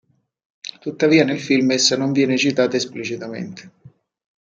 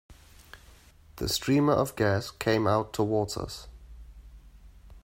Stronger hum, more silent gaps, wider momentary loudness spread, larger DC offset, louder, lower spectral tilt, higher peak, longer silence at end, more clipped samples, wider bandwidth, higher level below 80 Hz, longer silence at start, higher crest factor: neither; neither; first, 18 LU vs 13 LU; neither; first, -18 LUFS vs -27 LUFS; second, -4 dB/octave vs -5.5 dB/octave; first, -2 dBFS vs -12 dBFS; first, 0.8 s vs 0.05 s; neither; second, 9 kHz vs 16 kHz; second, -66 dBFS vs -50 dBFS; first, 0.65 s vs 0.1 s; about the same, 18 dB vs 18 dB